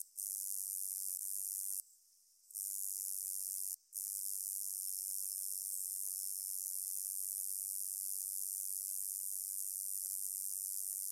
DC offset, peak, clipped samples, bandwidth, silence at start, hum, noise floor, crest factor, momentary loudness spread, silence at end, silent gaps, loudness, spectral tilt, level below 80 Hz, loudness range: under 0.1%; -20 dBFS; under 0.1%; 16 kHz; 0 s; none; -69 dBFS; 22 dB; 1 LU; 0 s; none; -39 LUFS; 8.5 dB/octave; under -90 dBFS; 2 LU